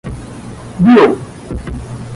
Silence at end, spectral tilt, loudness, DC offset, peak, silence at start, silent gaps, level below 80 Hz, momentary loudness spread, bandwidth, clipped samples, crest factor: 0 s; -7.5 dB/octave; -10 LUFS; under 0.1%; 0 dBFS; 0.05 s; none; -32 dBFS; 21 LU; 11.5 kHz; under 0.1%; 14 dB